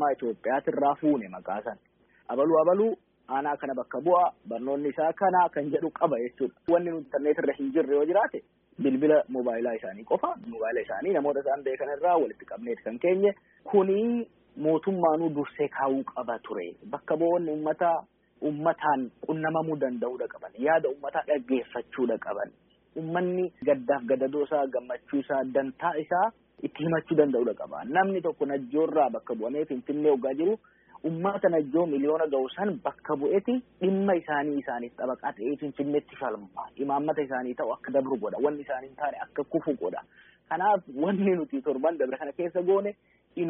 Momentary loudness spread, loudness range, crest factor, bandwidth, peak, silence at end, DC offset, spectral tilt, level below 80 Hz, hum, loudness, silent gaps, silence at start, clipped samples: 10 LU; 3 LU; 20 dB; 3.7 kHz; -8 dBFS; 0 s; under 0.1%; -2.5 dB/octave; -72 dBFS; none; -28 LUFS; none; 0 s; under 0.1%